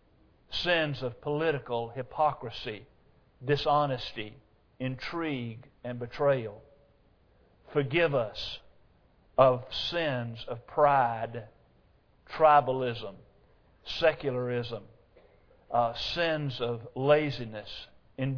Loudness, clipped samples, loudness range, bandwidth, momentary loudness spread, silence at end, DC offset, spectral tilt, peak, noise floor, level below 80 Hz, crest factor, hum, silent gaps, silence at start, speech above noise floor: -29 LUFS; under 0.1%; 5 LU; 5.4 kHz; 17 LU; 0 s; under 0.1%; -6.5 dB/octave; -8 dBFS; -64 dBFS; -58 dBFS; 22 dB; none; none; 0.5 s; 35 dB